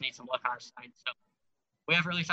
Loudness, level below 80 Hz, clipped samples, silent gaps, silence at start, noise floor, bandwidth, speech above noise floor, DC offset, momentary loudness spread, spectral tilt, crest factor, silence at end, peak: -32 LUFS; -80 dBFS; under 0.1%; none; 0 s; -82 dBFS; 8 kHz; 48 dB; under 0.1%; 20 LU; -4 dB/octave; 22 dB; 0 s; -12 dBFS